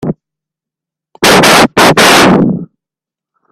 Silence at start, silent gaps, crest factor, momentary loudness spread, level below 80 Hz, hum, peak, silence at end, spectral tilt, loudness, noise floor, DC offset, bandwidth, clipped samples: 0 s; none; 10 dB; 16 LU; -40 dBFS; none; 0 dBFS; 0.85 s; -3.5 dB/octave; -5 LUFS; -85 dBFS; under 0.1%; over 20 kHz; 0.9%